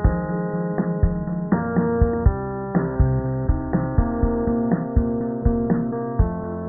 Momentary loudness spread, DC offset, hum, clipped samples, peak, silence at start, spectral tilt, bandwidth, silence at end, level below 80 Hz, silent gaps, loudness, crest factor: 4 LU; under 0.1%; none; under 0.1%; -4 dBFS; 0 s; -16.5 dB/octave; 2.1 kHz; 0 s; -26 dBFS; none; -22 LUFS; 18 dB